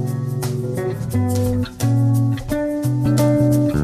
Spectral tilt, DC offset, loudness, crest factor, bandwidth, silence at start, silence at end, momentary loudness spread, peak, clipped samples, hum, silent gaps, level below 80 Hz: -7.5 dB/octave; under 0.1%; -19 LUFS; 12 dB; 14.5 kHz; 0 s; 0 s; 7 LU; -6 dBFS; under 0.1%; none; none; -38 dBFS